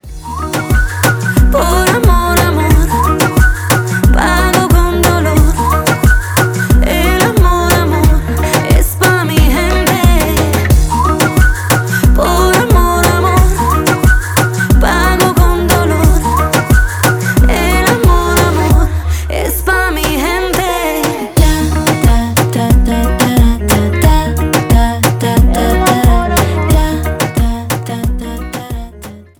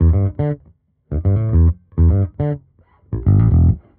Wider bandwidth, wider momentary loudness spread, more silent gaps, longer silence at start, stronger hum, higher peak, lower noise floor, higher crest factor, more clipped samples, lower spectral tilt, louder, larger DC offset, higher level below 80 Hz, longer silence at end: first, over 20 kHz vs 2.3 kHz; second, 5 LU vs 13 LU; neither; about the same, 0.05 s vs 0 s; neither; first, 0 dBFS vs -4 dBFS; second, -31 dBFS vs -53 dBFS; about the same, 10 dB vs 12 dB; neither; second, -5 dB/octave vs -12.5 dB/octave; first, -11 LUFS vs -17 LUFS; neither; first, -14 dBFS vs -22 dBFS; about the same, 0.2 s vs 0.2 s